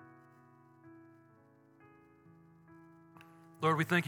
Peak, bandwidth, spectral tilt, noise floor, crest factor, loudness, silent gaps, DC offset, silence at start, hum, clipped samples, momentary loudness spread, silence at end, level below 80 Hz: -14 dBFS; 17.5 kHz; -6 dB/octave; -64 dBFS; 26 dB; -32 LUFS; none; under 0.1%; 3.6 s; none; under 0.1%; 29 LU; 0 s; -88 dBFS